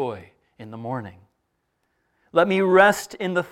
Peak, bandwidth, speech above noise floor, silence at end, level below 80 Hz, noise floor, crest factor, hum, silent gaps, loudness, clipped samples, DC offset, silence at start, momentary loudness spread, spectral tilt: -2 dBFS; 16 kHz; 53 dB; 0.05 s; -66 dBFS; -74 dBFS; 22 dB; none; none; -20 LUFS; under 0.1%; under 0.1%; 0 s; 24 LU; -5 dB/octave